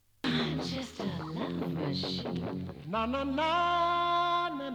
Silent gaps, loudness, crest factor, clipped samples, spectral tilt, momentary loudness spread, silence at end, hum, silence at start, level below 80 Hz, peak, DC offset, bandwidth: none; -32 LUFS; 14 dB; under 0.1%; -6 dB/octave; 9 LU; 0 s; none; 0.25 s; -56 dBFS; -18 dBFS; under 0.1%; 19.5 kHz